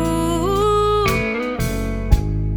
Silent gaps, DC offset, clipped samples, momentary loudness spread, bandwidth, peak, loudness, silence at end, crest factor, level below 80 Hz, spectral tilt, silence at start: none; under 0.1%; under 0.1%; 6 LU; over 20 kHz; 0 dBFS; -19 LUFS; 0 s; 18 dB; -24 dBFS; -6 dB/octave; 0 s